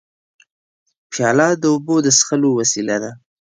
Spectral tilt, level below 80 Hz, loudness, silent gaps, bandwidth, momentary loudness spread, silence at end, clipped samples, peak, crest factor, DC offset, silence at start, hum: -3.5 dB/octave; -64 dBFS; -16 LUFS; none; 10 kHz; 10 LU; 0.25 s; under 0.1%; -2 dBFS; 16 dB; under 0.1%; 1.1 s; none